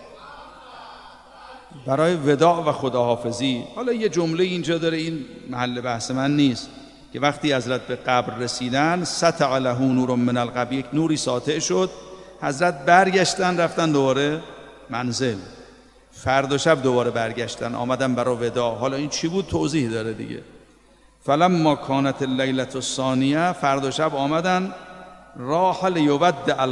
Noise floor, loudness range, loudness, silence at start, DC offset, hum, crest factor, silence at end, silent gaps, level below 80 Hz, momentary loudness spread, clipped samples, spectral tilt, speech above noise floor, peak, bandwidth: -54 dBFS; 3 LU; -22 LUFS; 0 s; under 0.1%; none; 22 dB; 0 s; none; -56 dBFS; 16 LU; under 0.1%; -5 dB/octave; 33 dB; 0 dBFS; 11.5 kHz